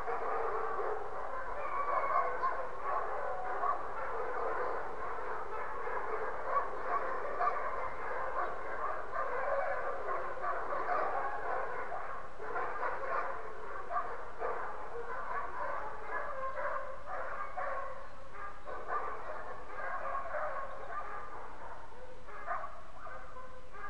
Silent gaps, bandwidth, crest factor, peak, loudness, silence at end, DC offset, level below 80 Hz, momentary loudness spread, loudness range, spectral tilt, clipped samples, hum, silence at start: none; 11 kHz; 20 dB; -18 dBFS; -38 LUFS; 0 s; 1%; -60 dBFS; 11 LU; 6 LU; -5.5 dB/octave; under 0.1%; none; 0 s